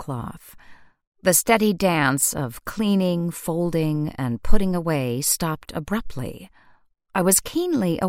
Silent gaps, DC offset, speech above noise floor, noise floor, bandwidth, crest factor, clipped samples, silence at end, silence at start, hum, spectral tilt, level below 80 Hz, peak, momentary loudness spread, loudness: 1.07-1.12 s; under 0.1%; 35 dB; -56 dBFS; 16.5 kHz; 20 dB; under 0.1%; 0 s; 0 s; none; -4.5 dB/octave; -34 dBFS; -2 dBFS; 13 LU; -22 LUFS